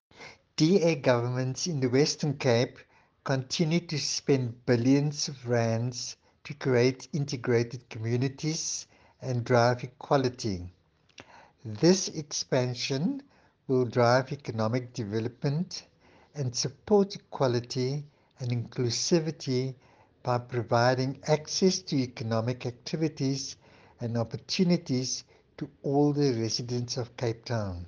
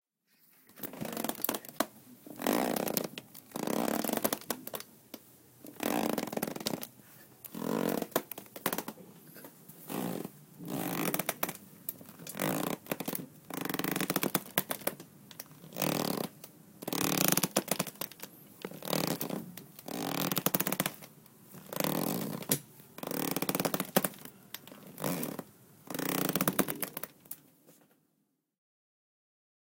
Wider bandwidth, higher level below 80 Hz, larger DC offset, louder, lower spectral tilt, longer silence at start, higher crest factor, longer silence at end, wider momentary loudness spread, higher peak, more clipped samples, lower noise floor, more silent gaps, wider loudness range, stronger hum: second, 10 kHz vs 17 kHz; first, -66 dBFS vs -72 dBFS; neither; first, -29 LUFS vs -34 LUFS; first, -5 dB/octave vs -3.5 dB/octave; second, 0.2 s vs 0.7 s; second, 20 dB vs 30 dB; second, 0 s vs 2.05 s; second, 12 LU vs 19 LU; about the same, -8 dBFS vs -6 dBFS; neither; second, -55 dBFS vs -78 dBFS; neither; about the same, 3 LU vs 5 LU; neither